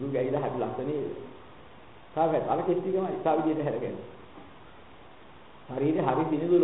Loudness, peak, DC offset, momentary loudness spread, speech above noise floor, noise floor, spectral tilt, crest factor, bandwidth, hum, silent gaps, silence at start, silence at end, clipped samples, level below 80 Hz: -29 LUFS; -12 dBFS; 0.2%; 22 LU; 24 dB; -52 dBFS; -11.5 dB/octave; 18 dB; 4 kHz; none; none; 0 s; 0 s; under 0.1%; -62 dBFS